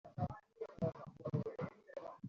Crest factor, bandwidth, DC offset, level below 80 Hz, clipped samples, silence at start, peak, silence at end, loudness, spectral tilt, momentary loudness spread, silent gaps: 18 dB; 7.2 kHz; under 0.1%; -70 dBFS; under 0.1%; 0.05 s; -26 dBFS; 0 s; -45 LUFS; -9 dB/octave; 9 LU; none